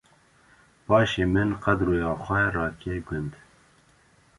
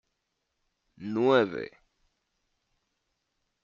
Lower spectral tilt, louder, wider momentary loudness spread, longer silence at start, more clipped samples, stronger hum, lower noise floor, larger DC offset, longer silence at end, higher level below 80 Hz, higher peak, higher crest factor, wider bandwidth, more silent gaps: first, -7 dB/octave vs -4 dB/octave; about the same, -25 LUFS vs -26 LUFS; second, 12 LU vs 19 LU; about the same, 0.9 s vs 1 s; neither; neither; second, -60 dBFS vs -81 dBFS; neither; second, 1.05 s vs 1.95 s; first, -44 dBFS vs -74 dBFS; first, -6 dBFS vs -12 dBFS; about the same, 20 dB vs 20 dB; first, 11.5 kHz vs 7.2 kHz; neither